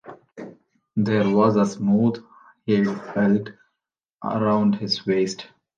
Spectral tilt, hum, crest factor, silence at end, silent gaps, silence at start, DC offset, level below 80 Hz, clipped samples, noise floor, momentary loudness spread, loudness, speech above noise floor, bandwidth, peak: -6.5 dB/octave; none; 16 dB; 0.35 s; 4.05-4.14 s; 0.05 s; under 0.1%; -62 dBFS; under 0.1%; -84 dBFS; 21 LU; -22 LUFS; 63 dB; 7.4 kHz; -6 dBFS